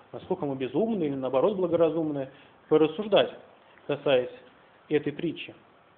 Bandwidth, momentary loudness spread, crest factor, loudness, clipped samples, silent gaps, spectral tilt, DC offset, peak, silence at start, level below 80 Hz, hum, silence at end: 4.2 kHz; 12 LU; 18 dB; -27 LUFS; under 0.1%; none; -4.5 dB/octave; under 0.1%; -8 dBFS; 0.15 s; -68 dBFS; none; 0.45 s